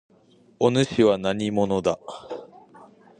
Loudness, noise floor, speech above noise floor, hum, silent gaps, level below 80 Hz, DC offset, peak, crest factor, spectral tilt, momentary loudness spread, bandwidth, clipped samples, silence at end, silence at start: -23 LUFS; -57 dBFS; 35 dB; none; none; -56 dBFS; under 0.1%; -4 dBFS; 20 dB; -6 dB/octave; 17 LU; 10 kHz; under 0.1%; 0.35 s; 0.6 s